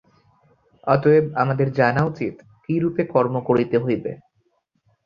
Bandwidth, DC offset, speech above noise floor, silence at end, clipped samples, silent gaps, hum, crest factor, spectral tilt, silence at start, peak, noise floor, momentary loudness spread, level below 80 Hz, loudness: 7 kHz; under 0.1%; 48 dB; 0.9 s; under 0.1%; none; none; 18 dB; -9.5 dB/octave; 0.85 s; -2 dBFS; -67 dBFS; 14 LU; -56 dBFS; -21 LUFS